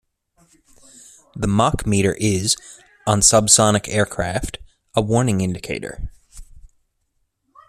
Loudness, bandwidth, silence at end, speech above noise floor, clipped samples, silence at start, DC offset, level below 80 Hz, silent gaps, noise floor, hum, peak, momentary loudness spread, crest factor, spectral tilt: -18 LUFS; 14.5 kHz; 1.05 s; 51 dB; under 0.1%; 1.35 s; under 0.1%; -40 dBFS; none; -70 dBFS; none; 0 dBFS; 19 LU; 20 dB; -4 dB/octave